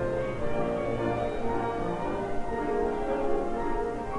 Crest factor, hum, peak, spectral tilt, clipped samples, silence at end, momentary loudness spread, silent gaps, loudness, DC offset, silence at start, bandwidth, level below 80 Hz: 14 dB; none; -16 dBFS; -7.5 dB/octave; under 0.1%; 0 s; 3 LU; none; -30 LUFS; under 0.1%; 0 s; 11 kHz; -40 dBFS